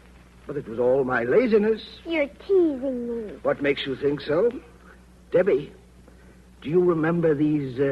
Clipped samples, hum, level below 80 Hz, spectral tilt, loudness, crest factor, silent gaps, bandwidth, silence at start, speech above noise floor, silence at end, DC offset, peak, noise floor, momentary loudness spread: under 0.1%; none; -52 dBFS; -8 dB/octave; -23 LUFS; 16 dB; none; 9 kHz; 0.45 s; 27 dB; 0 s; under 0.1%; -8 dBFS; -50 dBFS; 10 LU